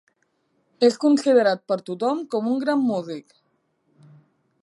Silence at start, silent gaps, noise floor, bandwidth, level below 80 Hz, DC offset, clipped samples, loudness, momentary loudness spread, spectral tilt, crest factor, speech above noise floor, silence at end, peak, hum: 0.8 s; none; -69 dBFS; 11.5 kHz; -78 dBFS; under 0.1%; under 0.1%; -21 LUFS; 11 LU; -5.5 dB/octave; 18 dB; 48 dB; 1.4 s; -6 dBFS; none